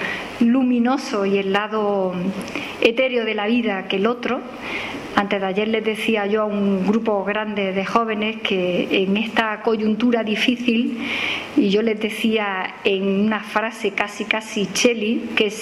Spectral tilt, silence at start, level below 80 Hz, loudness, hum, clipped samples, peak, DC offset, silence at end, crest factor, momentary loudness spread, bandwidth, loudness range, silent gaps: -5 dB/octave; 0 s; -58 dBFS; -20 LUFS; none; under 0.1%; 0 dBFS; under 0.1%; 0 s; 20 dB; 5 LU; 13.5 kHz; 2 LU; none